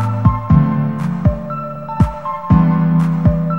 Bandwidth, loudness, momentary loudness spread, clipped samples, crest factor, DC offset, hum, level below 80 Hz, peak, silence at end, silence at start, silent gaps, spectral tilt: 4.5 kHz; -16 LUFS; 11 LU; under 0.1%; 14 dB; 1%; none; -26 dBFS; 0 dBFS; 0 s; 0 s; none; -10.5 dB/octave